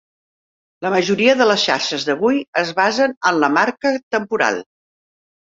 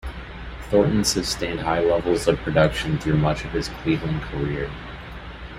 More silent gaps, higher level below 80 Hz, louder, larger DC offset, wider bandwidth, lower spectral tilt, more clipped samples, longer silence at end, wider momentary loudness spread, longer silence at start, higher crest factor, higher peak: first, 2.48-2.53 s, 3.17-3.21 s, 4.03-4.11 s vs none; second, -64 dBFS vs -36 dBFS; first, -17 LUFS vs -22 LUFS; neither; second, 7.8 kHz vs 15 kHz; second, -3.5 dB/octave vs -5 dB/octave; neither; first, 0.9 s vs 0 s; second, 7 LU vs 17 LU; first, 0.8 s vs 0.05 s; about the same, 18 dB vs 20 dB; about the same, -2 dBFS vs -2 dBFS